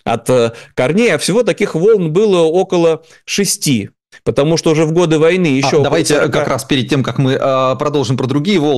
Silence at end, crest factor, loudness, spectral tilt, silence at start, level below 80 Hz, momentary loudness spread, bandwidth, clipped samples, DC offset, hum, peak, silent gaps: 0 s; 10 dB; -13 LUFS; -5 dB/octave; 0.05 s; -48 dBFS; 5 LU; 12.5 kHz; under 0.1%; 0.4%; none; -4 dBFS; none